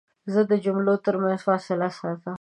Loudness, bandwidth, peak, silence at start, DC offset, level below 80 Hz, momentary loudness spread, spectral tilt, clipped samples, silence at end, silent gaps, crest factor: -24 LUFS; 9.2 kHz; -8 dBFS; 0.25 s; under 0.1%; -74 dBFS; 6 LU; -8 dB/octave; under 0.1%; 0.05 s; none; 16 dB